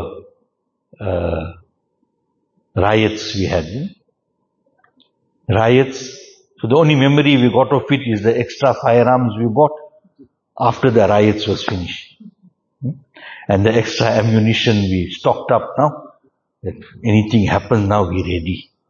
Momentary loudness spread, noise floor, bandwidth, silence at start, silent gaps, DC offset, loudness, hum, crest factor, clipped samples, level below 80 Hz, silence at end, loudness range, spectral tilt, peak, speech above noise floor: 17 LU; -70 dBFS; 7.2 kHz; 0 s; none; under 0.1%; -16 LUFS; none; 16 dB; under 0.1%; -44 dBFS; 0.3 s; 7 LU; -6.5 dB/octave; 0 dBFS; 54 dB